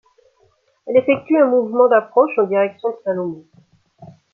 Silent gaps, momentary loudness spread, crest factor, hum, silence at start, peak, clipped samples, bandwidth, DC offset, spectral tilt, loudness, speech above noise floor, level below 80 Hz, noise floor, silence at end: none; 11 LU; 16 dB; none; 0.85 s; -2 dBFS; under 0.1%; 4.1 kHz; under 0.1%; -9 dB/octave; -17 LUFS; 44 dB; -70 dBFS; -60 dBFS; 0.25 s